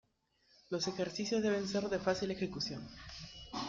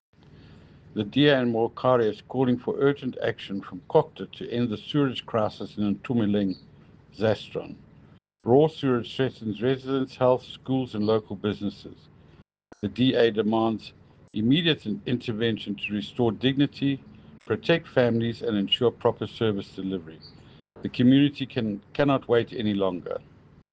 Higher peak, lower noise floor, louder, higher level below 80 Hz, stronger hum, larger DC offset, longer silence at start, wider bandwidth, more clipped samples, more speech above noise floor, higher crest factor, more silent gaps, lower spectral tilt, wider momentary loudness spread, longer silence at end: second, -20 dBFS vs -6 dBFS; first, -74 dBFS vs -56 dBFS; second, -37 LUFS vs -26 LUFS; about the same, -64 dBFS vs -60 dBFS; neither; neither; second, 0.7 s vs 0.95 s; about the same, 7.6 kHz vs 7.8 kHz; neither; first, 37 dB vs 31 dB; about the same, 18 dB vs 20 dB; neither; second, -4.5 dB/octave vs -8 dB/octave; about the same, 14 LU vs 13 LU; second, 0 s vs 0.55 s